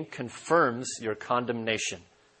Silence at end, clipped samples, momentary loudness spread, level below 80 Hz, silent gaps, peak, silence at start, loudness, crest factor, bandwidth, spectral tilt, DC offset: 0.35 s; under 0.1%; 13 LU; -70 dBFS; none; -10 dBFS; 0 s; -29 LUFS; 20 dB; 8.8 kHz; -3.5 dB/octave; under 0.1%